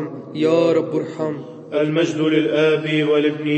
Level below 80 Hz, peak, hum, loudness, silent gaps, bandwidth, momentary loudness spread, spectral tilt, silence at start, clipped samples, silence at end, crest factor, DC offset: -70 dBFS; -4 dBFS; none; -19 LUFS; none; 8.6 kHz; 9 LU; -6.5 dB/octave; 0 s; under 0.1%; 0 s; 14 dB; under 0.1%